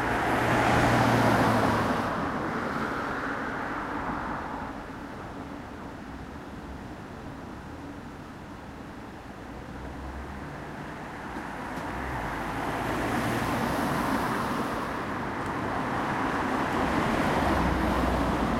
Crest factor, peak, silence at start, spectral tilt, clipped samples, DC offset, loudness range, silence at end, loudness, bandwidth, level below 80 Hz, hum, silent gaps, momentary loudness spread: 20 dB; -10 dBFS; 0 s; -6 dB/octave; under 0.1%; under 0.1%; 15 LU; 0 s; -28 LUFS; 16 kHz; -42 dBFS; none; none; 17 LU